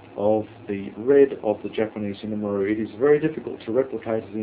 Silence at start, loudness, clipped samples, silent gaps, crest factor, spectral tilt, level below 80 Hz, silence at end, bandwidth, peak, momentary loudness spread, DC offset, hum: 0.05 s; -24 LUFS; under 0.1%; none; 18 dB; -11 dB/octave; -58 dBFS; 0 s; 4 kHz; -6 dBFS; 13 LU; under 0.1%; none